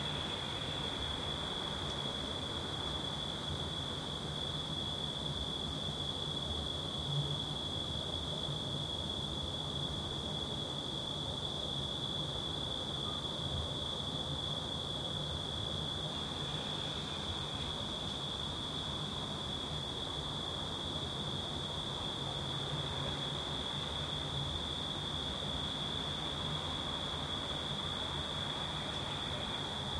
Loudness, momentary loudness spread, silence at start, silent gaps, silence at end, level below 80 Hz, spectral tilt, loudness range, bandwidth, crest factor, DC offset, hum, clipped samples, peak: -37 LUFS; 1 LU; 0 s; none; 0 s; -54 dBFS; -4 dB/octave; 1 LU; 13 kHz; 14 dB; under 0.1%; none; under 0.1%; -26 dBFS